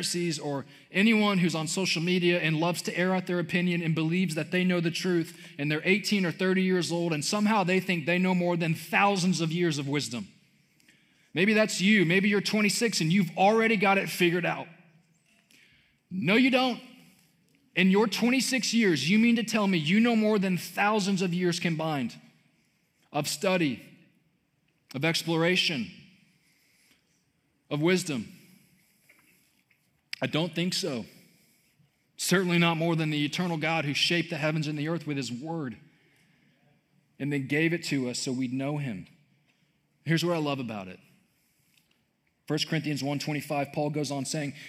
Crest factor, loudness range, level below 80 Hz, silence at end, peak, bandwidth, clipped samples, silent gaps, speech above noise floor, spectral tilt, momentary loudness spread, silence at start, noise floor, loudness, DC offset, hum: 20 dB; 9 LU; -80 dBFS; 0 s; -8 dBFS; 16 kHz; under 0.1%; none; 46 dB; -5 dB/octave; 11 LU; 0 s; -73 dBFS; -27 LUFS; under 0.1%; none